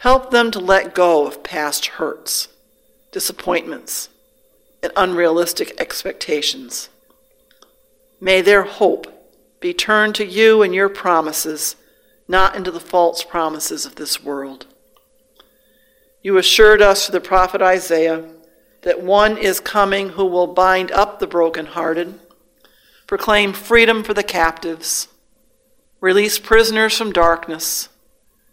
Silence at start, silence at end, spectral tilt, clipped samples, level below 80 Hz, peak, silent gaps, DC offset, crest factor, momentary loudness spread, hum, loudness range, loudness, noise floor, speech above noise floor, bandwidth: 0 s; 0.65 s; -2.5 dB/octave; under 0.1%; -38 dBFS; 0 dBFS; none; under 0.1%; 18 dB; 13 LU; none; 7 LU; -16 LUFS; -59 dBFS; 43 dB; 16.5 kHz